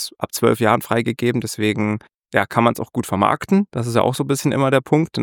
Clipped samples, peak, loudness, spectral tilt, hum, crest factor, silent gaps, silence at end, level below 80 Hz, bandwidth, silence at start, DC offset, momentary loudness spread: under 0.1%; -2 dBFS; -19 LUFS; -5.5 dB/octave; none; 18 dB; 2.14-2.19 s; 0 s; -56 dBFS; 19 kHz; 0 s; under 0.1%; 6 LU